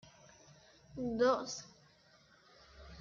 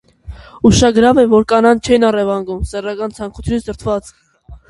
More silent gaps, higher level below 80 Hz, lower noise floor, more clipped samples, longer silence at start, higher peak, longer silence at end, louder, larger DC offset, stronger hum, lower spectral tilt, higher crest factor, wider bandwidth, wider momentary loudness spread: neither; second, -66 dBFS vs -32 dBFS; first, -66 dBFS vs -34 dBFS; neither; first, 0.95 s vs 0.25 s; second, -20 dBFS vs 0 dBFS; second, 0 s vs 0.15 s; second, -35 LUFS vs -14 LUFS; neither; neither; second, -4 dB/octave vs -5.5 dB/octave; first, 20 dB vs 14 dB; second, 7.4 kHz vs 11.5 kHz; first, 27 LU vs 12 LU